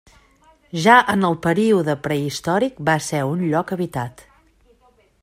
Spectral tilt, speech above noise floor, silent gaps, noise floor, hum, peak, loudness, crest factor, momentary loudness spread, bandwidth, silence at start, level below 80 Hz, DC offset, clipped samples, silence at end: -5.5 dB/octave; 38 dB; none; -57 dBFS; none; 0 dBFS; -19 LUFS; 20 dB; 12 LU; 16 kHz; 0.75 s; -56 dBFS; under 0.1%; under 0.1%; 1.1 s